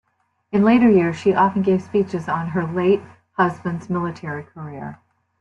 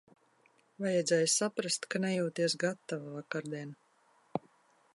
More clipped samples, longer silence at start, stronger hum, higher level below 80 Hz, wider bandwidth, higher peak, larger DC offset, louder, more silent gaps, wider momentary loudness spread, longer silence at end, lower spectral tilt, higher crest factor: neither; second, 0.5 s vs 0.8 s; neither; first, -58 dBFS vs -82 dBFS; second, 8.6 kHz vs 11.5 kHz; first, -4 dBFS vs -14 dBFS; neither; first, -19 LUFS vs -33 LUFS; neither; first, 18 LU vs 14 LU; about the same, 0.45 s vs 0.55 s; first, -8 dB/octave vs -3.5 dB/octave; about the same, 16 dB vs 20 dB